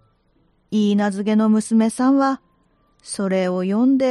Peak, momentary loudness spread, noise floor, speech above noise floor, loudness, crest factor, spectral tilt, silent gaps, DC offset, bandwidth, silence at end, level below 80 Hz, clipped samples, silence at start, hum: -6 dBFS; 8 LU; -61 dBFS; 44 dB; -19 LUFS; 12 dB; -6 dB/octave; none; under 0.1%; 11.5 kHz; 0 s; -64 dBFS; under 0.1%; 0.7 s; none